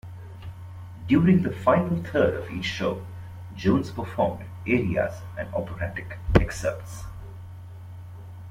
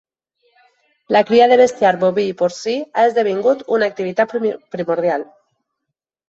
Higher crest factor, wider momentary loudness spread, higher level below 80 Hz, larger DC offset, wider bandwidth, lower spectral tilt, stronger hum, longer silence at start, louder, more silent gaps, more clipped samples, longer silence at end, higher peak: first, 24 dB vs 16 dB; first, 20 LU vs 10 LU; first, -40 dBFS vs -64 dBFS; neither; first, 15 kHz vs 8 kHz; first, -7 dB/octave vs -5 dB/octave; neither; second, 0.05 s vs 1.1 s; second, -25 LUFS vs -16 LUFS; neither; neither; second, 0 s vs 1.05 s; about the same, -2 dBFS vs -2 dBFS